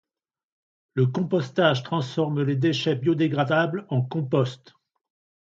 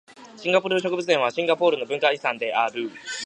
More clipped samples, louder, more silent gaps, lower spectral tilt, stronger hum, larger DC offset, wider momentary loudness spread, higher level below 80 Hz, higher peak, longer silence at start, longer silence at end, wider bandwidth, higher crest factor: neither; about the same, -24 LUFS vs -23 LUFS; neither; first, -7 dB/octave vs -3.5 dB/octave; neither; neither; about the same, 5 LU vs 7 LU; first, -68 dBFS vs -76 dBFS; about the same, -6 dBFS vs -4 dBFS; first, 0.95 s vs 0.1 s; first, 0.9 s vs 0 s; second, 7.6 kHz vs 10 kHz; about the same, 20 dB vs 20 dB